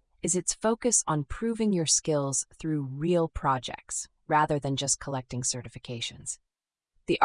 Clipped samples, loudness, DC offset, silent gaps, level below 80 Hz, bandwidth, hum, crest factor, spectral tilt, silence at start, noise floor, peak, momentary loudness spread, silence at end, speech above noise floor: under 0.1%; -28 LUFS; under 0.1%; none; -50 dBFS; 11 kHz; none; 22 dB; -3.5 dB/octave; 0.25 s; -79 dBFS; -8 dBFS; 11 LU; 0 s; 51 dB